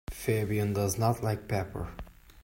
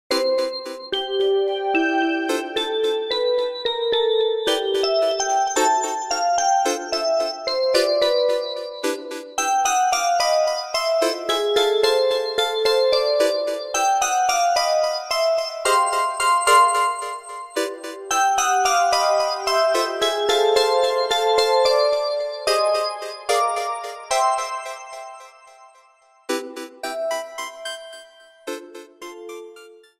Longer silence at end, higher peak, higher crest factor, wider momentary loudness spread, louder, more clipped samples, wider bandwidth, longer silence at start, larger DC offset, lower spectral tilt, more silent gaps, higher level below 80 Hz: second, 0.05 s vs 0.25 s; second, -12 dBFS vs -4 dBFS; about the same, 18 dB vs 18 dB; about the same, 12 LU vs 13 LU; second, -31 LUFS vs -20 LUFS; neither; about the same, 16.5 kHz vs 16 kHz; about the same, 0.1 s vs 0.1 s; neither; first, -6 dB/octave vs 0 dB/octave; neither; first, -48 dBFS vs -60 dBFS